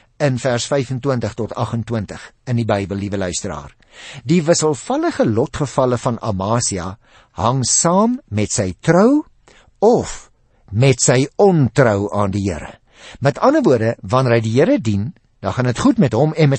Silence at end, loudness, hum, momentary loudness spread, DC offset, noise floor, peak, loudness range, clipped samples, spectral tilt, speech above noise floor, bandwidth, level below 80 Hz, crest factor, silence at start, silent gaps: 0 s; -17 LUFS; none; 13 LU; under 0.1%; -50 dBFS; -2 dBFS; 5 LU; under 0.1%; -5.5 dB/octave; 33 dB; 8.8 kHz; -46 dBFS; 16 dB; 0.2 s; none